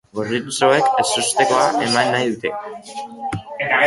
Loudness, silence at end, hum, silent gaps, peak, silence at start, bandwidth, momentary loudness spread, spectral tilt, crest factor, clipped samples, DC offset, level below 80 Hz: -18 LUFS; 0 s; none; none; -2 dBFS; 0.15 s; 12 kHz; 15 LU; -3 dB/octave; 16 dB; under 0.1%; under 0.1%; -56 dBFS